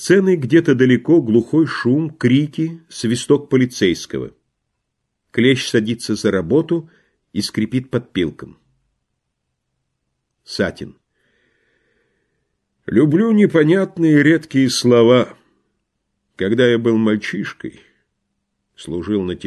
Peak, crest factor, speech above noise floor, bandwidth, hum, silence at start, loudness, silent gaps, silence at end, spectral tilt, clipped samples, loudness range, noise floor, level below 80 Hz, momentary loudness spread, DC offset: 0 dBFS; 16 dB; 59 dB; 12.5 kHz; none; 0 s; -16 LUFS; none; 0 s; -6 dB/octave; under 0.1%; 15 LU; -75 dBFS; -52 dBFS; 14 LU; under 0.1%